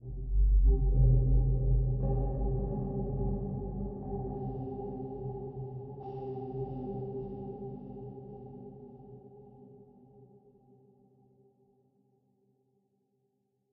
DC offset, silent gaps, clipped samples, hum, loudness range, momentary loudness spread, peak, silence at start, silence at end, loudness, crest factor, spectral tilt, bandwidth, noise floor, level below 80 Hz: under 0.1%; none; under 0.1%; none; 22 LU; 21 LU; -16 dBFS; 0 s; 3.5 s; -34 LUFS; 18 dB; -14 dB/octave; 1.2 kHz; -78 dBFS; -34 dBFS